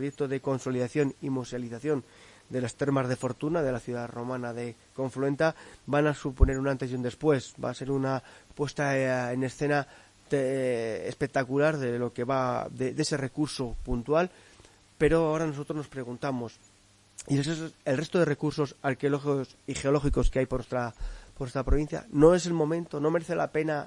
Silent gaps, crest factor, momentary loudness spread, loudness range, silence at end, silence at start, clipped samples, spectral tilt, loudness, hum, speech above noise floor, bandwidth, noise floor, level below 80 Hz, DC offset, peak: none; 22 dB; 9 LU; 4 LU; 0 s; 0 s; under 0.1%; -6.5 dB/octave; -29 LUFS; none; 32 dB; 11.5 kHz; -60 dBFS; -40 dBFS; under 0.1%; -6 dBFS